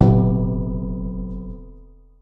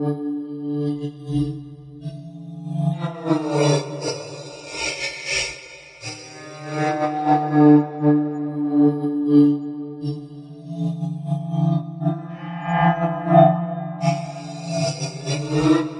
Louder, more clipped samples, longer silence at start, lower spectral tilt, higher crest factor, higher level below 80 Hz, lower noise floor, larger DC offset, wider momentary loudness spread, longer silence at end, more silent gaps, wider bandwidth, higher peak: about the same, -22 LUFS vs -21 LUFS; neither; about the same, 0 s vs 0 s; first, -12 dB/octave vs -6.5 dB/octave; about the same, 18 dB vs 20 dB; first, -30 dBFS vs -54 dBFS; first, -45 dBFS vs -41 dBFS; neither; about the same, 19 LU vs 19 LU; first, 0.35 s vs 0 s; neither; second, 4.2 kHz vs 10.5 kHz; about the same, -2 dBFS vs -2 dBFS